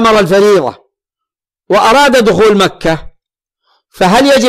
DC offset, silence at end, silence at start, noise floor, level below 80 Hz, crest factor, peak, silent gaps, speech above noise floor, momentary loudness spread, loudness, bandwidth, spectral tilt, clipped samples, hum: under 0.1%; 0 s; 0 s; -81 dBFS; -38 dBFS; 8 dB; -2 dBFS; none; 74 dB; 9 LU; -8 LUFS; 15.5 kHz; -4.5 dB/octave; under 0.1%; none